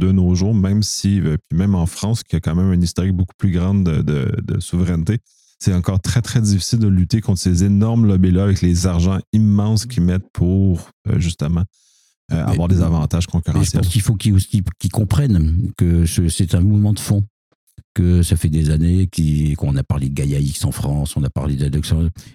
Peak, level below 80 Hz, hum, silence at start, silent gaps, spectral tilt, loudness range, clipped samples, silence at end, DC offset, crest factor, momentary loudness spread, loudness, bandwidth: -2 dBFS; -30 dBFS; none; 0 s; 3.34-3.39 s, 9.27-9.33 s, 10.30-10.34 s, 10.93-11.05 s, 12.17-12.29 s, 17.30-17.67 s, 17.84-17.95 s; -6.5 dB/octave; 3 LU; under 0.1%; 0.15 s; under 0.1%; 14 dB; 6 LU; -17 LUFS; 15 kHz